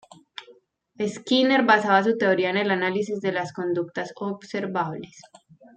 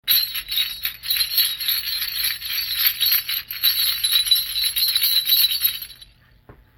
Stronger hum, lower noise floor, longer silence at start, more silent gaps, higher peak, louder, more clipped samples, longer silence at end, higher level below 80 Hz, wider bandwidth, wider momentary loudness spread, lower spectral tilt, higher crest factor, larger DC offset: neither; first, -56 dBFS vs -50 dBFS; first, 0.4 s vs 0.05 s; neither; about the same, -4 dBFS vs -4 dBFS; second, -23 LUFS vs -18 LUFS; neither; first, 0.55 s vs 0.25 s; second, -72 dBFS vs -52 dBFS; second, 9.2 kHz vs 17 kHz; first, 21 LU vs 8 LU; first, -5 dB/octave vs 3 dB/octave; about the same, 20 dB vs 18 dB; neither